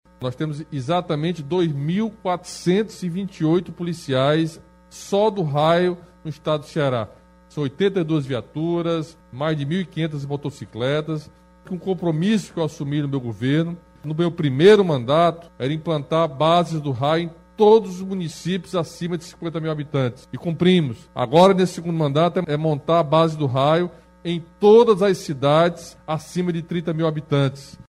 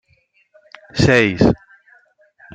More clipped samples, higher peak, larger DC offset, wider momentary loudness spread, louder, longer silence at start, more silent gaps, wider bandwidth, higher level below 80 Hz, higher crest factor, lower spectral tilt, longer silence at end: neither; about the same, -2 dBFS vs -2 dBFS; neither; about the same, 13 LU vs 14 LU; second, -21 LUFS vs -16 LUFS; second, 0.2 s vs 0.95 s; neither; first, 12.5 kHz vs 9.4 kHz; second, -56 dBFS vs -40 dBFS; about the same, 18 dB vs 18 dB; about the same, -7 dB/octave vs -6 dB/octave; second, 0.1 s vs 1 s